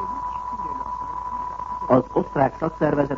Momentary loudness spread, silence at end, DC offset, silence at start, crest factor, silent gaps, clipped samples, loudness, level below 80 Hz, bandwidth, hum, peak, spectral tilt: 10 LU; 0 s; under 0.1%; 0 s; 20 dB; none; under 0.1%; -24 LUFS; -46 dBFS; 7.6 kHz; none; -4 dBFS; -9 dB/octave